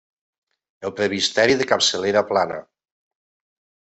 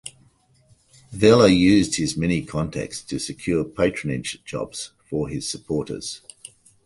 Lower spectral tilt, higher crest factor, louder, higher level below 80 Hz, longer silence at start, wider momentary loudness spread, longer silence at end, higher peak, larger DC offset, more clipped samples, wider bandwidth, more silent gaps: second, -2.5 dB/octave vs -5 dB/octave; about the same, 22 dB vs 20 dB; first, -19 LUFS vs -22 LUFS; second, -62 dBFS vs -46 dBFS; first, 0.8 s vs 0.05 s; second, 14 LU vs 18 LU; first, 1.3 s vs 0.7 s; about the same, -2 dBFS vs -2 dBFS; neither; neither; second, 8.4 kHz vs 11.5 kHz; neither